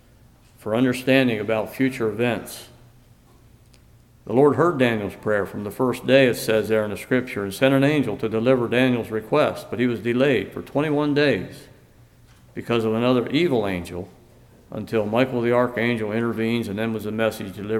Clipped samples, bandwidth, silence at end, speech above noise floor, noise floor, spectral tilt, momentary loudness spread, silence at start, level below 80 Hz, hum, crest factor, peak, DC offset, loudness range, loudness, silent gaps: under 0.1%; 16.5 kHz; 0 s; 31 dB; -52 dBFS; -6 dB/octave; 11 LU; 0.65 s; -56 dBFS; none; 18 dB; -4 dBFS; under 0.1%; 4 LU; -22 LUFS; none